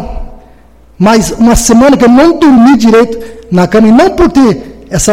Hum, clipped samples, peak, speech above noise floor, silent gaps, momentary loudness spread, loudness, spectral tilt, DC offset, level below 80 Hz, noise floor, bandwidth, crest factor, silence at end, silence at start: none; 0.9%; 0 dBFS; 34 dB; none; 12 LU; -6 LUFS; -5 dB/octave; under 0.1%; -24 dBFS; -39 dBFS; 16 kHz; 6 dB; 0 s; 0 s